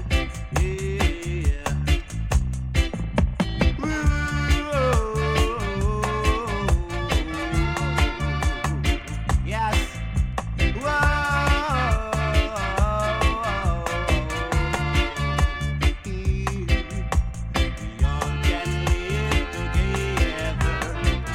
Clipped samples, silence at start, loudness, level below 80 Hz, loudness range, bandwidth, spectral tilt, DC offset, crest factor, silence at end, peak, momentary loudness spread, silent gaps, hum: under 0.1%; 0 s; -24 LUFS; -26 dBFS; 2 LU; 15.5 kHz; -5.5 dB/octave; under 0.1%; 18 dB; 0 s; -4 dBFS; 4 LU; none; none